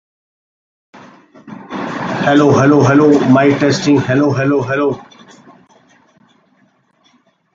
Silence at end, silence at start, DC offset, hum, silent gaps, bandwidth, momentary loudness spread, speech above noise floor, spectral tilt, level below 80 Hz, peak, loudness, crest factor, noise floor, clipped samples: 2.55 s; 0.95 s; under 0.1%; none; none; 7.6 kHz; 15 LU; 45 dB; -6.5 dB/octave; -52 dBFS; 0 dBFS; -12 LUFS; 14 dB; -56 dBFS; under 0.1%